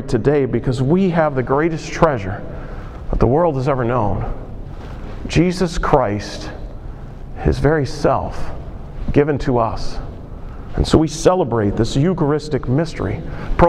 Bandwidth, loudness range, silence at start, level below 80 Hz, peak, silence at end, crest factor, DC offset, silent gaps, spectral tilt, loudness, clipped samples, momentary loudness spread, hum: 12 kHz; 3 LU; 0 s; -28 dBFS; 0 dBFS; 0 s; 18 dB; under 0.1%; none; -7 dB/octave; -18 LUFS; under 0.1%; 17 LU; none